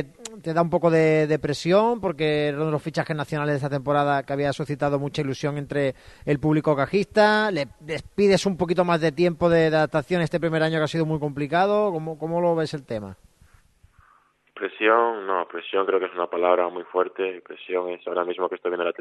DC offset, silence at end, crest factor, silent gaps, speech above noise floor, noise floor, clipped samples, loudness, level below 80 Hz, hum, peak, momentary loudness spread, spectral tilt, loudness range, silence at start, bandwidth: under 0.1%; 0.1 s; 18 dB; none; 38 dB; -61 dBFS; under 0.1%; -23 LUFS; -54 dBFS; none; -4 dBFS; 10 LU; -6.5 dB/octave; 5 LU; 0 s; 12 kHz